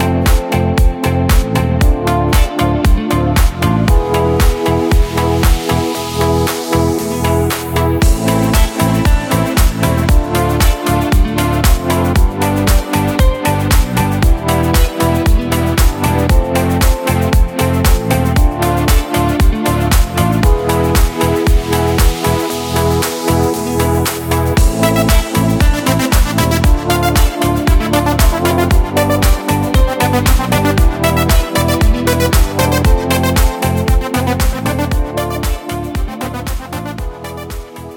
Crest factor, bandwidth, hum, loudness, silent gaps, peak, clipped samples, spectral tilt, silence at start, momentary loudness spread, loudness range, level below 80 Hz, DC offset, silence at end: 12 dB; 19.5 kHz; none; -14 LUFS; none; 0 dBFS; under 0.1%; -5.5 dB/octave; 0 s; 3 LU; 1 LU; -16 dBFS; under 0.1%; 0 s